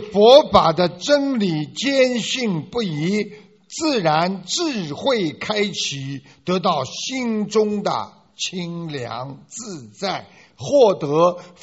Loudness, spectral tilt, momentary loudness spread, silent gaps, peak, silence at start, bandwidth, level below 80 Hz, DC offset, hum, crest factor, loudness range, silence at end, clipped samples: -19 LUFS; -3.5 dB/octave; 16 LU; none; 0 dBFS; 0 s; 8 kHz; -52 dBFS; under 0.1%; none; 20 dB; 5 LU; 0.15 s; under 0.1%